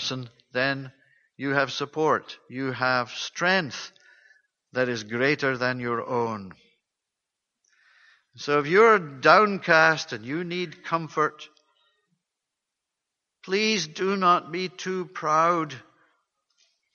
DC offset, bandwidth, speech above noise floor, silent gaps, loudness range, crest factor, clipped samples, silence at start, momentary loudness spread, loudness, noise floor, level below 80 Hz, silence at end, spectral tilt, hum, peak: under 0.1%; 7.2 kHz; 61 dB; none; 9 LU; 22 dB; under 0.1%; 0 s; 15 LU; -24 LUFS; -85 dBFS; -72 dBFS; 1.15 s; -4.5 dB/octave; none; -4 dBFS